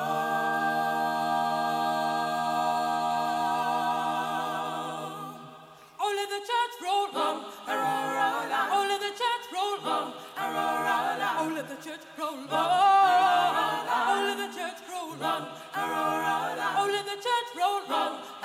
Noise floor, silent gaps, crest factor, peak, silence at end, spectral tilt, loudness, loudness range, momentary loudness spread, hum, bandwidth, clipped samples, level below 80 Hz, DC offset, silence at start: -50 dBFS; none; 16 dB; -14 dBFS; 0 s; -3 dB/octave; -28 LUFS; 6 LU; 10 LU; none; 16.5 kHz; under 0.1%; -78 dBFS; under 0.1%; 0 s